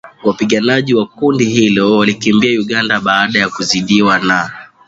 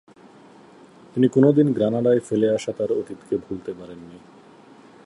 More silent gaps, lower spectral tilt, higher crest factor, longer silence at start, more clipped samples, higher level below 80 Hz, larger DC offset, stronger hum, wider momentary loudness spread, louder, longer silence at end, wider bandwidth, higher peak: neither; second, -4.5 dB/octave vs -8 dB/octave; second, 12 dB vs 20 dB; second, 0.05 s vs 1.15 s; neither; first, -50 dBFS vs -62 dBFS; neither; neither; second, 4 LU vs 18 LU; first, -12 LUFS vs -21 LUFS; second, 0.2 s vs 0.9 s; second, 8 kHz vs 11 kHz; first, 0 dBFS vs -4 dBFS